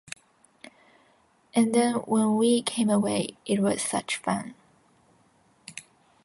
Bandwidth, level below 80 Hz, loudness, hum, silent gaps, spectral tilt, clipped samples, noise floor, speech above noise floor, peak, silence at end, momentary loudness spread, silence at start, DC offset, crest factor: 11.5 kHz; -68 dBFS; -25 LUFS; none; none; -4.5 dB/octave; under 0.1%; -63 dBFS; 39 dB; -12 dBFS; 0.45 s; 20 LU; 1.55 s; under 0.1%; 16 dB